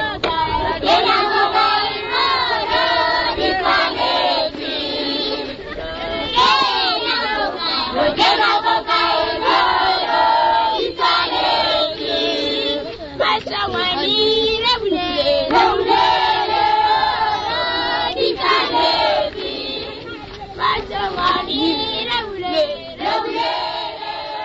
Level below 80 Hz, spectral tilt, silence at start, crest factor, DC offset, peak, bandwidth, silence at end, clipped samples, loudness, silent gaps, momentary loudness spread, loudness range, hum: -42 dBFS; -4 dB/octave; 0 s; 16 dB; under 0.1%; -2 dBFS; 8 kHz; 0 s; under 0.1%; -17 LUFS; none; 9 LU; 4 LU; none